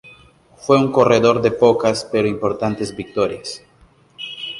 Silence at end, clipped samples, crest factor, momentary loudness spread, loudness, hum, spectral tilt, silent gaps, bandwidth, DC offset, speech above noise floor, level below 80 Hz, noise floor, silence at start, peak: 0 s; under 0.1%; 18 dB; 17 LU; -17 LUFS; none; -5.5 dB/octave; none; 11.5 kHz; under 0.1%; 36 dB; -52 dBFS; -52 dBFS; 0.05 s; 0 dBFS